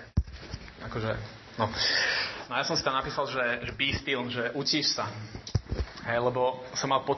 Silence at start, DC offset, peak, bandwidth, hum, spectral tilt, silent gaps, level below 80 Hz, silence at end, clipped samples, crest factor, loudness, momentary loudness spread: 0 s; under 0.1%; -12 dBFS; 6.2 kHz; none; -3.5 dB/octave; none; -44 dBFS; 0 s; under 0.1%; 18 dB; -29 LUFS; 12 LU